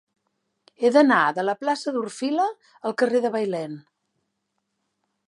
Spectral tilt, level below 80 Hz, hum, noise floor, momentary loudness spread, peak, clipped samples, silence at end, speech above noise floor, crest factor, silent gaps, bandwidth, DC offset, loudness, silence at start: -5 dB/octave; -82 dBFS; none; -77 dBFS; 13 LU; -4 dBFS; under 0.1%; 1.45 s; 55 dB; 20 dB; none; 11 kHz; under 0.1%; -23 LUFS; 0.8 s